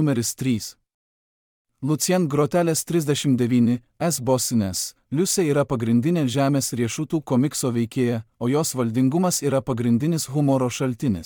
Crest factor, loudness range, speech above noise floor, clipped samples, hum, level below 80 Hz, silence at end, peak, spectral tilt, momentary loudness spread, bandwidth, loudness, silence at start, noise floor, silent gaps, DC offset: 14 dB; 1 LU; over 69 dB; under 0.1%; none; -58 dBFS; 0 s; -8 dBFS; -5.5 dB/octave; 5 LU; 18.5 kHz; -22 LUFS; 0 s; under -90 dBFS; 0.94-1.65 s; under 0.1%